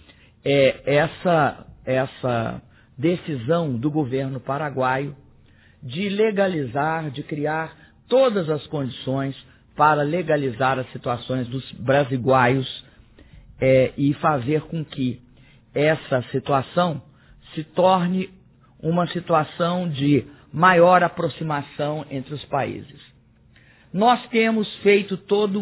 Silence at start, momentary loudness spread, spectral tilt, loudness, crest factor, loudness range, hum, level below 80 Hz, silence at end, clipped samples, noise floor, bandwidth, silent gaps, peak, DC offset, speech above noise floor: 0.45 s; 12 LU; -10.5 dB/octave; -22 LUFS; 20 dB; 5 LU; none; -54 dBFS; 0 s; under 0.1%; -54 dBFS; 4 kHz; none; -2 dBFS; under 0.1%; 33 dB